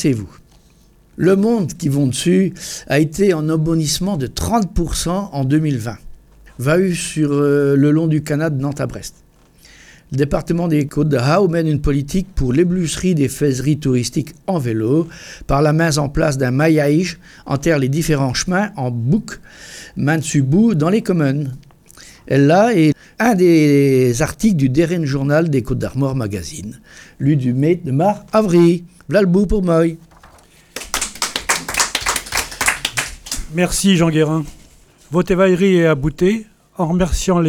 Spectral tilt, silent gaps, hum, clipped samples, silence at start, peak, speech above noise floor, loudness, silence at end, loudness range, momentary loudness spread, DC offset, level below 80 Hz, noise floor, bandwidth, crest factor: -5.5 dB/octave; none; none; under 0.1%; 0 s; 0 dBFS; 34 dB; -16 LUFS; 0 s; 4 LU; 11 LU; under 0.1%; -34 dBFS; -50 dBFS; 18.5 kHz; 16 dB